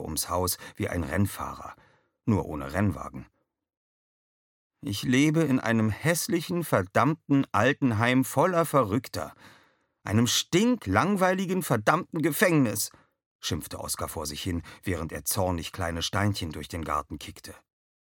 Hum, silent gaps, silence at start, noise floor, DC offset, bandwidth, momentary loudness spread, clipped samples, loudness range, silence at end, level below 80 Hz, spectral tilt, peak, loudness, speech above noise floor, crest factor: none; 3.77-4.70 s, 13.26-13.39 s; 0 s; -63 dBFS; under 0.1%; 17.5 kHz; 13 LU; under 0.1%; 7 LU; 0.6 s; -52 dBFS; -5 dB/octave; -6 dBFS; -27 LUFS; 36 dB; 22 dB